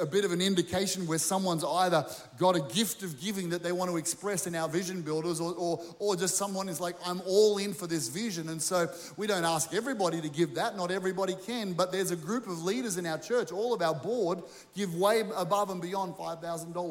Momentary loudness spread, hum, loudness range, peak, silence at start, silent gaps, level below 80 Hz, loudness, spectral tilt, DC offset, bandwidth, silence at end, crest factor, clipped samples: 7 LU; none; 2 LU; -12 dBFS; 0 s; none; -70 dBFS; -31 LUFS; -4 dB/octave; under 0.1%; 17 kHz; 0 s; 20 dB; under 0.1%